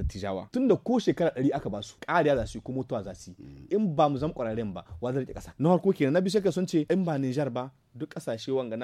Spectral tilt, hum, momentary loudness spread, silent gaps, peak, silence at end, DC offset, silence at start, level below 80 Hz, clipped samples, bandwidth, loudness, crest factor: -7 dB/octave; none; 13 LU; none; -10 dBFS; 0 s; under 0.1%; 0 s; -48 dBFS; under 0.1%; 13.5 kHz; -28 LUFS; 18 dB